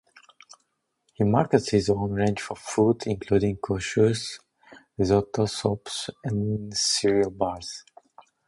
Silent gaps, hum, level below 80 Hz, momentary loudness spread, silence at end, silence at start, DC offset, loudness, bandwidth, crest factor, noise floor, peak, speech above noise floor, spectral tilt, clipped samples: none; none; -50 dBFS; 10 LU; 0.7 s; 1.2 s; under 0.1%; -25 LUFS; 11.5 kHz; 22 dB; -74 dBFS; -4 dBFS; 50 dB; -5 dB/octave; under 0.1%